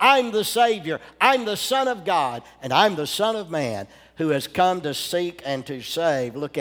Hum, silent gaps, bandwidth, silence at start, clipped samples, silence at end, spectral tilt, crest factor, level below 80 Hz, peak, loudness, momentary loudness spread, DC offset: none; none; over 20 kHz; 0 s; under 0.1%; 0 s; -3.5 dB/octave; 22 dB; -62 dBFS; -2 dBFS; -22 LUFS; 10 LU; under 0.1%